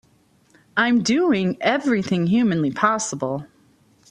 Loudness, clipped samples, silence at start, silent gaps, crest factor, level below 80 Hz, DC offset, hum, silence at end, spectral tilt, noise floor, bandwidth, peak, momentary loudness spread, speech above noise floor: -20 LUFS; under 0.1%; 0.75 s; none; 18 dB; -60 dBFS; under 0.1%; none; 0.65 s; -5 dB/octave; -59 dBFS; 10.5 kHz; -2 dBFS; 8 LU; 39 dB